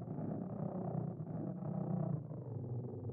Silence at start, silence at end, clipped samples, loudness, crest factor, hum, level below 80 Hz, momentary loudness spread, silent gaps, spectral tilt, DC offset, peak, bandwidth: 0 s; 0 s; under 0.1%; -42 LUFS; 14 dB; none; -72 dBFS; 5 LU; none; -11 dB/octave; under 0.1%; -28 dBFS; 2.3 kHz